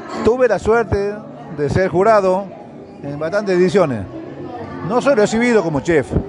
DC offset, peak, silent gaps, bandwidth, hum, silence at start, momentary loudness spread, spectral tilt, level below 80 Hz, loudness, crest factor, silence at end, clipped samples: under 0.1%; -2 dBFS; none; 11 kHz; none; 0 s; 17 LU; -6.5 dB/octave; -40 dBFS; -16 LUFS; 14 dB; 0 s; under 0.1%